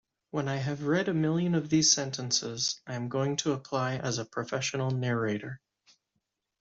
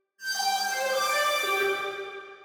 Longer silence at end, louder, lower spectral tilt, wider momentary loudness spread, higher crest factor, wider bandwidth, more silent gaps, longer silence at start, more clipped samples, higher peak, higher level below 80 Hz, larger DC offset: first, 1.05 s vs 0 s; second, -29 LUFS vs -26 LUFS; first, -4 dB/octave vs 0.5 dB/octave; about the same, 10 LU vs 9 LU; first, 22 dB vs 16 dB; second, 8 kHz vs 19.5 kHz; neither; first, 0.35 s vs 0.2 s; neither; first, -10 dBFS vs -14 dBFS; first, -68 dBFS vs -78 dBFS; neither